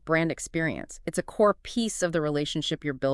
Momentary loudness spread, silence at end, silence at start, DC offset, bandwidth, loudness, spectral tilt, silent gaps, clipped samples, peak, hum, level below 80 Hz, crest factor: 8 LU; 0 s; 0.05 s; under 0.1%; 12 kHz; -28 LUFS; -4.5 dB/octave; none; under 0.1%; -10 dBFS; none; -52 dBFS; 16 dB